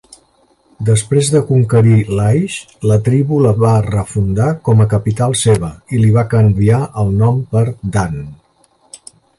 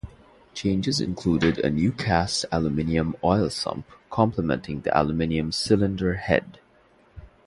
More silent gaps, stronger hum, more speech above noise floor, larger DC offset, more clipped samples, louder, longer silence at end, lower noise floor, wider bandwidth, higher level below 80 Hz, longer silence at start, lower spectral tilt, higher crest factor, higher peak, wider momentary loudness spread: neither; neither; first, 42 dB vs 34 dB; neither; neither; first, -13 LUFS vs -24 LUFS; first, 0.45 s vs 0.2 s; second, -54 dBFS vs -58 dBFS; about the same, 11.5 kHz vs 11.5 kHz; first, -36 dBFS vs -42 dBFS; first, 0.8 s vs 0.05 s; first, -7 dB/octave vs -5.5 dB/octave; second, 12 dB vs 20 dB; first, 0 dBFS vs -4 dBFS; about the same, 7 LU vs 7 LU